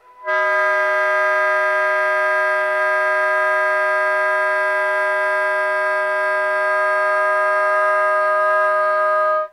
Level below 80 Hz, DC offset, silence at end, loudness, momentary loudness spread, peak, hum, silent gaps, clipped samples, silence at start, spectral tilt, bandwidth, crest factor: -86 dBFS; under 0.1%; 0.05 s; -17 LUFS; 2 LU; -6 dBFS; none; none; under 0.1%; 0.2 s; -0.5 dB/octave; 13 kHz; 12 dB